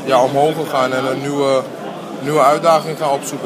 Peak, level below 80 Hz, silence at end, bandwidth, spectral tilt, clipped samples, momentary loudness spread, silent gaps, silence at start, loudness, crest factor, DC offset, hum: 0 dBFS; -66 dBFS; 0 s; 15.5 kHz; -5 dB/octave; under 0.1%; 12 LU; none; 0 s; -16 LUFS; 16 dB; under 0.1%; none